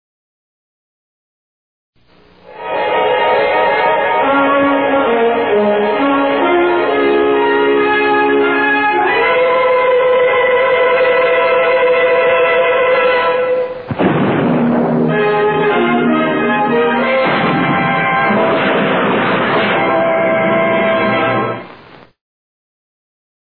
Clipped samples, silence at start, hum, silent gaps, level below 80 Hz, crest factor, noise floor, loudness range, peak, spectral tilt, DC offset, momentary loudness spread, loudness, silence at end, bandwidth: under 0.1%; 2.5 s; none; none; -52 dBFS; 12 dB; -47 dBFS; 4 LU; -2 dBFS; -9.5 dB/octave; 0.3%; 3 LU; -12 LUFS; 1.75 s; 4.5 kHz